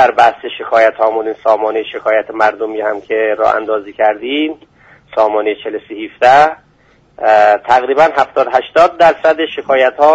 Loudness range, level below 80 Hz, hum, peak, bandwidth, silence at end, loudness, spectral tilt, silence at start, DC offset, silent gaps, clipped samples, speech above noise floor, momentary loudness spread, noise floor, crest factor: 5 LU; -52 dBFS; none; 0 dBFS; 8 kHz; 0 s; -12 LUFS; -4.5 dB/octave; 0 s; under 0.1%; none; under 0.1%; 38 dB; 10 LU; -50 dBFS; 12 dB